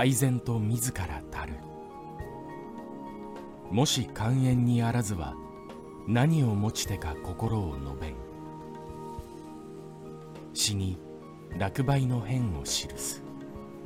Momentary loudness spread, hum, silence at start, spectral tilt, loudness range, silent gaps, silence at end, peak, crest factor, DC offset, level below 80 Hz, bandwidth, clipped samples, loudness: 18 LU; none; 0 s; -5 dB/octave; 8 LU; none; 0 s; -12 dBFS; 18 dB; under 0.1%; -48 dBFS; 16.5 kHz; under 0.1%; -29 LUFS